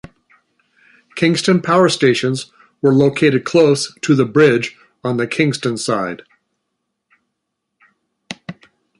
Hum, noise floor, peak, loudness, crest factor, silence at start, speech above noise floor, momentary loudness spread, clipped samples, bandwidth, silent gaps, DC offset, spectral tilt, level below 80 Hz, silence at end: none; -76 dBFS; -2 dBFS; -15 LUFS; 16 dB; 1.15 s; 61 dB; 19 LU; under 0.1%; 11.5 kHz; none; under 0.1%; -5.5 dB/octave; -58 dBFS; 0.45 s